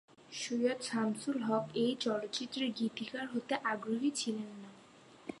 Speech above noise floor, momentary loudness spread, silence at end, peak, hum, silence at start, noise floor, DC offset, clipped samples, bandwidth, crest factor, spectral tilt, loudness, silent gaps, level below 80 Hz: 23 dB; 14 LU; 0 s; -18 dBFS; none; 0.2 s; -59 dBFS; under 0.1%; under 0.1%; 11 kHz; 18 dB; -4 dB/octave; -36 LUFS; none; -80 dBFS